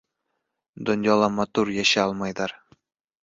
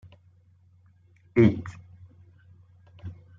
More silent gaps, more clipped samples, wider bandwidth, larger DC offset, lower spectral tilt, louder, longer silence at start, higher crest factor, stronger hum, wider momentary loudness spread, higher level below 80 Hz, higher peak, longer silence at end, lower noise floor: neither; neither; about the same, 7.8 kHz vs 7.4 kHz; neither; second, -4 dB/octave vs -9.5 dB/octave; about the same, -23 LUFS vs -24 LUFS; second, 0.75 s vs 1.35 s; about the same, 20 dB vs 24 dB; neither; second, 11 LU vs 23 LU; about the same, -60 dBFS vs -60 dBFS; about the same, -6 dBFS vs -6 dBFS; first, 0.65 s vs 0.25 s; first, -79 dBFS vs -59 dBFS